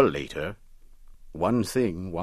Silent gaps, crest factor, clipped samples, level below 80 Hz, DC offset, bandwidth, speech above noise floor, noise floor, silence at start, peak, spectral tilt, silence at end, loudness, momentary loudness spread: none; 22 dB; under 0.1%; -48 dBFS; under 0.1%; 14 kHz; 22 dB; -48 dBFS; 0 s; -6 dBFS; -6 dB/octave; 0 s; -28 LUFS; 17 LU